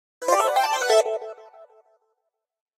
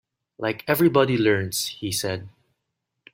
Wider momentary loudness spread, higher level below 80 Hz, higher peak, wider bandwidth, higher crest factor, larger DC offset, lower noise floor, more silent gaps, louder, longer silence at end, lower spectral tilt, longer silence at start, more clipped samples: about the same, 12 LU vs 11 LU; second, -84 dBFS vs -62 dBFS; about the same, -4 dBFS vs -4 dBFS; about the same, 16 kHz vs 16.5 kHz; about the same, 20 dB vs 20 dB; neither; about the same, -79 dBFS vs -80 dBFS; neither; about the same, -21 LUFS vs -23 LUFS; first, 1.15 s vs 0.85 s; second, 1.5 dB/octave vs -4.5 dB/octave; second, 0.2 s vs 0.4 s; neither